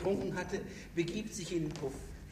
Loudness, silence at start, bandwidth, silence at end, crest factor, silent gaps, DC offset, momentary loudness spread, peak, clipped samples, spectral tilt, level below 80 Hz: -38 LUFS; 0 s; 15.5 kHz; 0 s; 18 dB; none; under 0.1%; 6 LU; -20 dBFS; under 0.1%; -5.5 dB/octave; -54 dBFS